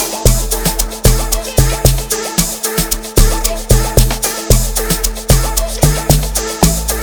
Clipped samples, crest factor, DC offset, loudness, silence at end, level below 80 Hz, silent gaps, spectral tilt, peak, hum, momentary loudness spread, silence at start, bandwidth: under 0.1%; 12 dB; under 0.1%; -14 LUFS; 0 s; -16 dBFS; none; -4 dB/octave; 0 dBFS; none; 4 LU; 0 s; over 20 kHz